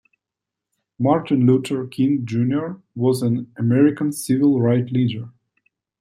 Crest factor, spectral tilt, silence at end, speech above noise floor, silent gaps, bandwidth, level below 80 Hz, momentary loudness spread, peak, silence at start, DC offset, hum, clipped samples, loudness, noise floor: 16 dB; -7.5 dB/octave; 0.7 s; 67 dB; none; 15.5 kHz; -64 dBFS; 8 LU; -4 dBFS; 1 s; under 0.1%; none; under 0.1%; -20 LUFS; -85 dBFS